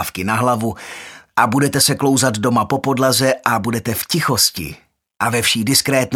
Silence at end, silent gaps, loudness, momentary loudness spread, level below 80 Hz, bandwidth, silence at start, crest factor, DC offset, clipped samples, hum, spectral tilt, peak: 0 s; none; -16 LUFS; 10 LU; -50 dBFS; 18 kHz; 0 s; 18 dB; under 0.1%; under 0.1%; none; -3.5 dB/octave; 0 dBFS